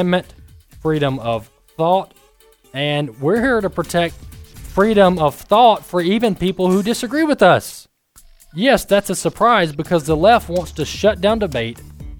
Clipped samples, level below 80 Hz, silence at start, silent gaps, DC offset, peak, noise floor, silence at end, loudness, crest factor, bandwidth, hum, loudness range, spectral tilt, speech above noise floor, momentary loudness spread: under 0.1%; -40 dBFS; 0 s; none; under 0.1%; 0 dBFS; -51 dBFS; 0 s; -17 LUFS; 16 dB; 19.5 kHz; none; 5 LU; -5.5 dB/octave; 35 dB; 11 LU